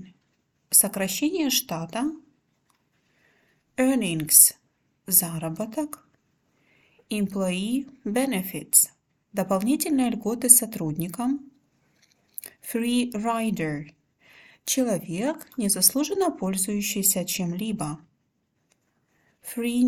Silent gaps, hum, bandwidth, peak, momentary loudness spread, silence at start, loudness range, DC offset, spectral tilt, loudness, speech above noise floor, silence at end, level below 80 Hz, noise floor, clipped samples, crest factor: none; none; 19 kHz; 0 dBFS; 16 LU; 0 s; 8 LU; under 0.1%; -3 dB/octave; -23 LUFS; 48 dB; 0 s; -64 dBFS; -73 dBFS; under 0.1%; 26 dB